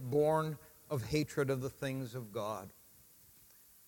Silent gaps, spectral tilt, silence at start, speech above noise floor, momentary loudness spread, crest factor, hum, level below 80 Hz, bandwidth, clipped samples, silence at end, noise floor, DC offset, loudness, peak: none; -6.5 dB/octave; 0 s; 27 dB; 12 LU; 18 dB; none; -64 dBFS; 17.5 kHz; under 0.1%; 1.15 s; -62 dBFS; under 0.1%; -37 LUFS; -20 dBFS